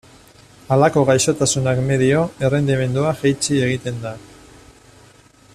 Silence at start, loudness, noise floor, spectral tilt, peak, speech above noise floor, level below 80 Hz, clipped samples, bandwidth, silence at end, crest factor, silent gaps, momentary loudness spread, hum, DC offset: 0.7 s; -18 LUFS; -49 dBFS; -5 dB/octave; -2 dBFS; 32 dB; -48 dBFS; under 0.1%; 14 kHz; 1.3 s; 16 dB; none; 10 LU; none; under 0.1%